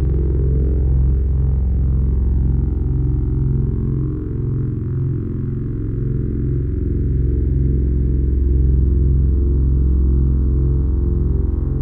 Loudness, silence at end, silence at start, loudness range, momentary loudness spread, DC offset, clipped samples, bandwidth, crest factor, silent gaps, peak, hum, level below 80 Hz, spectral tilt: -19 LUFS; 0 s; 0 s; 4 LU; 5 LU; under 0.1%; under 0.1%; 1.8 kHz; 10 dB; none; -6 dBFS; none; -18 dBFS; -13.5 dB/octave